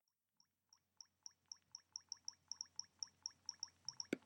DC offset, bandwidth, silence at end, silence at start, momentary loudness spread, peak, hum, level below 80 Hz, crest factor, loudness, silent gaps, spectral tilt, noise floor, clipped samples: under 0.1%; 16.5 kHz; 0.05 s; 1 s; 10 LU; -26 dBFS; none; under -90 dBFS; 30 dB; -52 LUFS; none; -1 dB/octave; -82 dBFS; under 0.1%